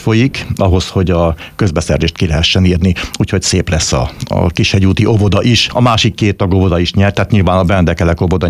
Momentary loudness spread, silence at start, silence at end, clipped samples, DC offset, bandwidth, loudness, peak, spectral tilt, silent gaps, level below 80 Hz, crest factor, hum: 5 LU; 0 s; 0 s; under 0.1%; under 0.1%; 13.5 kHz; -12 LUFS; 0 dBFS; -5.5 dB/octave; none; -26 dBFS; 10 dB; none